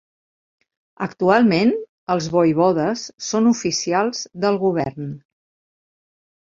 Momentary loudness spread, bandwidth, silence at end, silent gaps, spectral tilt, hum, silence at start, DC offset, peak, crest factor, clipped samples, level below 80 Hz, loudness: 13 LU; 7.6 kHz; 1.4 s; 1.89-2.07 s, 3.14-3.18 s; -5 dB/octave; none; 1 s; under 0.1%; -2 dBFS; 20 dB; under 0.1%; -58 dBFS; -19 LUFS